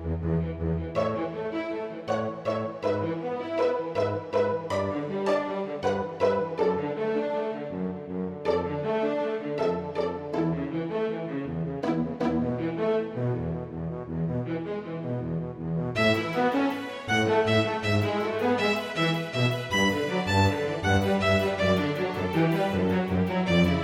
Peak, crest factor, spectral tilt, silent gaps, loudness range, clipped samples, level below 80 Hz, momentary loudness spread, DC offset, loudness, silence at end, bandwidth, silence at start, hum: -10 dBFS; 16 dB; -6.5 dB/octave; none; 5 LU; under 0.1%; -50 dBFS; 8 LU; under 0.1%; -27 LUFS; 0 s; 16 kHz; 0 s; none